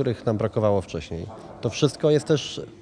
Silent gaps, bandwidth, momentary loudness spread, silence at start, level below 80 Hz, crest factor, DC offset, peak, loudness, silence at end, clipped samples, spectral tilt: none; 10.5 kHz; 13 LU; 0 s; -52 dBFS; 18 dB; under 0.1%; -6 dBFS; -24 LUFS; 0 s; under 0.1%; -6 dB/octave